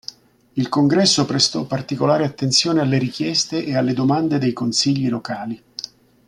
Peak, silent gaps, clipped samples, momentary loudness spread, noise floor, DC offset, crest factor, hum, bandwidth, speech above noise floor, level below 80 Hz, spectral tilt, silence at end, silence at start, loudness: -2 dBFS; none; under 0.1%; 14 LU; -40 dBFS; under 0.1%; 16 dB; none; 12 kHz; 21 dB; -58 dBFS; -4.5 dB/octave; 0.4 s; 0.55 s; -18 LUFS